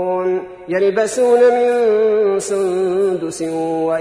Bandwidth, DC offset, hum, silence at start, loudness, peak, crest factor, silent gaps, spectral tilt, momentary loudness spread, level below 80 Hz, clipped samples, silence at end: 11 kHz; under 0.1%; none; 0 s; -16 LUFS; -4 dBFS; 12 dB; none; -5 dB/octave; 9 LU; -58 dBFS; under 0.1%; 0 s